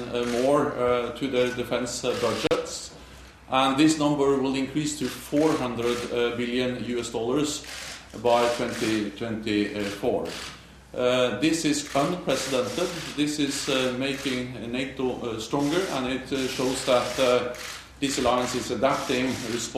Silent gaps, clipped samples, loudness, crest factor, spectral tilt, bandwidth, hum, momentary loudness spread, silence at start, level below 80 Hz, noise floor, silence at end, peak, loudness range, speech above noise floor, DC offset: none; under 0.1%; -26 LUFS; 18 dB; -4 dB/octave; 14.5 kHz; none; 8 LU; 0 s; -52 dBFS; -46 dBFS; 0 s; -8 dBFS; 2 LU; 21 dB; under 0.1%